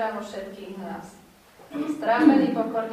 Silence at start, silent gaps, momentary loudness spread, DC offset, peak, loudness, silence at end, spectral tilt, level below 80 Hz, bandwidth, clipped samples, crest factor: 0 s; none; 19 LU; under 0.1%; -4 dBFS; -22 LUFS; 0 s; -6.5 dB/octave; -64 dBFS; 12 kHz; under 0.1%; 20 dB